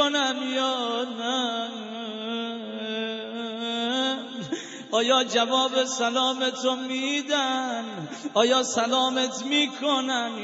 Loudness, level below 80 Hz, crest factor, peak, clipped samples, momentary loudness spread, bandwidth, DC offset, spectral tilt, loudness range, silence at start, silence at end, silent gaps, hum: -25 LUFS; -82 dBFS; 20 dB; -6 dBFS; under 0.1%; 11 LU; 8 kHz; under 0.1%; -2 dB/octave; 5 LU; 0 s; 0 s; none; none